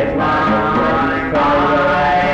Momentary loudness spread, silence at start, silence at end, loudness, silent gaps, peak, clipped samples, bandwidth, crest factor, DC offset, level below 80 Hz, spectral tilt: 2 LU; 0 s; 0 s; -14 LUFS; none; -8 dBFS; under 0.1%; 8.6 kHz; 8 dB; under 0.1%; -34 dBFS; -7 dB/octave